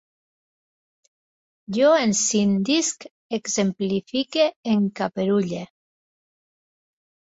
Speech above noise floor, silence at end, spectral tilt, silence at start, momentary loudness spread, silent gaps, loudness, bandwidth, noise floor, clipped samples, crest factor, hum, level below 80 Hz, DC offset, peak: over 69 dB; 1.65 s; -4 dB/octave; 1.7 s; 11 LU; 3.11-3.30 s, 4.56-4.63 s; -22 LUFS; 8 kHz; under -90 dBFS; under 0.1%; 18 dB; none; -64 dBFS; under 0.1%; -6 dBFS